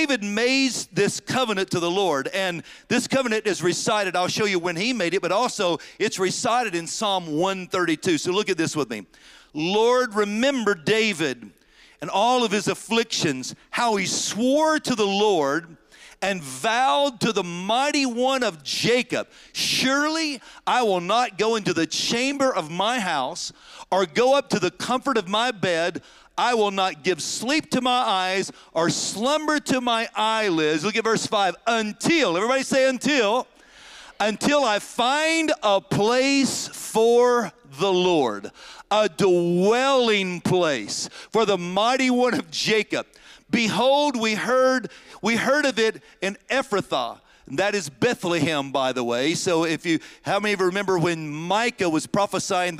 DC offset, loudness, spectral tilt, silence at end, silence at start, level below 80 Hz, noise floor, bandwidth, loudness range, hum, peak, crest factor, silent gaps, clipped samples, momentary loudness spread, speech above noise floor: under 0.1%; -22 LUFS; -3.5 dB/octave; 0 s; 0 s; -64 dBFS; -47 dBFS; 16 kHz; 2 LU; none; -8 dBFS; 16 dB; none; under 0.1%; 7 LU; 24 dB